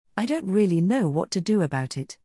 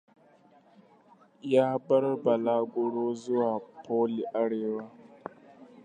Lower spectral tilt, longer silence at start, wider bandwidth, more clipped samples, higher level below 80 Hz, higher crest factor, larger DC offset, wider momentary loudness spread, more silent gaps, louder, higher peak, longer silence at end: about the same, -6.5 dB/octave vs -7.5 dB/octave; second, 0.15 s vs 1.45 s; first, 12 kHz vs 9.4 kHz; neither; first, -66 dBFS vs -82 dBFS; second, 14 dB vs 20 dB; neither; second, 6 LU vs 20 LU; neither; first, -24 LUFS vs -29 LUFS; about the same, -10 dBFS vs -10 dBFS; about the same, 0.1 s vs 0.2 s